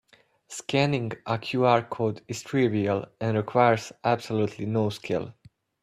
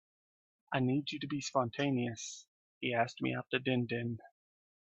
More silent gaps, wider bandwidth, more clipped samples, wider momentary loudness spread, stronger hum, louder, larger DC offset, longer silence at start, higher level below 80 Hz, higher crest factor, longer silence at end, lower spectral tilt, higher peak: second, none vs 2.48-2.81 s; first, 14 kHz vs 8.2 kHz; neither; about the same, 9 LU vs 9 LU; neither; first, -26 LUFS vs -36 LUFS; neither; second, 0.5 s vs 0.7 s; first, -64 dBFS vs -74 dBFS; about the same, 20 dB vs 20 dB; about the same, 0.5 s vs 0.55 s; about the same, -6 dB/octave vs -5 dB/octave; first, -6 dBFS vs -16 dBFS